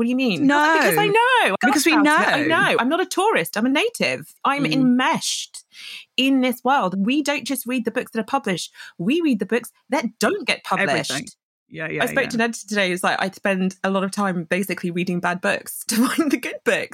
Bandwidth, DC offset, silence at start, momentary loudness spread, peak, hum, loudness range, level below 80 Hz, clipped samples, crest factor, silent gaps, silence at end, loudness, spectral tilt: 17 kHz; under 0.1%; 0 s; 10 LU; -4 dBFS; none; 6 LU; -70 dBFS; under 0.1%; 16 dB; 11.43-11.66 s; 0.05 s; -20 LUFS; -4 dB/octave